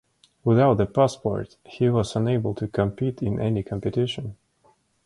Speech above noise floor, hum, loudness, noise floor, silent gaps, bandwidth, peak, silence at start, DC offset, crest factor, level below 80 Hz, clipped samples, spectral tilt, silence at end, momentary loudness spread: 40 dB; none; -24 LUFS; -63 dBFS; none; 11.5 kHz; -6 dBFS; 0.45 s; under 0.1%; 18 dB; -48 dBFS; under 0.1%; -7.5 dB/octave; 0.7 s; 10 LU